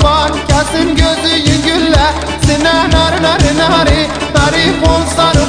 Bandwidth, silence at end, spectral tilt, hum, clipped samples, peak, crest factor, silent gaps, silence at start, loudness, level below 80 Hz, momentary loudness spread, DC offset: 10 kHz; 0 s; -4.5 dB/octave; none; under 0.1%; 0 dBFS; 10 dB; none; 0 s; -10 LUFS; -20 dBFS; 3 LU; under 0.1%